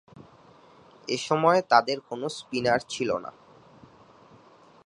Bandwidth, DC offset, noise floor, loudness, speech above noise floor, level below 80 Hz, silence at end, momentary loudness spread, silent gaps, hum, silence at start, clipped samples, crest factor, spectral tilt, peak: 11.5 kHz; under 0.1%; -55 dBFS; -25 LUFS; 30 dB; -66 dBFS; 1.55 s; 13 LU; none; none; 0.15 s; under 0.1%; 24 dB; -4.5 dB/octave; -4 dBFS